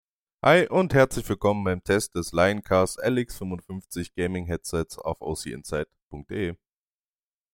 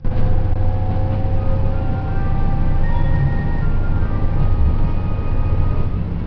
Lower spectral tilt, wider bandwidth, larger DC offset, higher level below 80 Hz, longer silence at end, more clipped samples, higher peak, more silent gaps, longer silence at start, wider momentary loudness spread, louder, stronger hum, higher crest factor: second, -5.5 dB/octave vs -10.5 dB/octave; first, 17 kHz vs 3.7 kHz; neither; second, -48 dBFS vs -18 dBFS; first, 1 s vs 0 s; neither; about the same, -4 dBFS vs -4 dBFS; first, 6.02-6.11 s vs none; first, 0.45 s vs 0 s; first, 14 LU vs 3 LU; second, -25 LUFS vs -21 LUFS; neither; first, 22 dB vs 12 dB